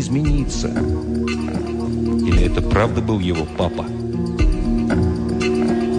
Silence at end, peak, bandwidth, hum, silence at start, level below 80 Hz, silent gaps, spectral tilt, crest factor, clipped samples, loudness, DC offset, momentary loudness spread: 0 s; -6 dBFS; 10 kHz; none; 0 s; -24 dBFS; none; -6.5 dB/octave; 12 dB; under 0.1%; -20 LUFS; under 0.1%; 5 LU